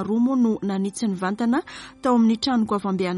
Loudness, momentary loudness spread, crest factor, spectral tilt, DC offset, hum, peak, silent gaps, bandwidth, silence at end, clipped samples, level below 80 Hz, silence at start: -22 LUFS; 7 LU; 14 dB; -6 dB/octave; under 0.1%; none; -8 dBFS; none; 11.5 kHz; 0 s; under 0.1%; -58 dBFS; 0 s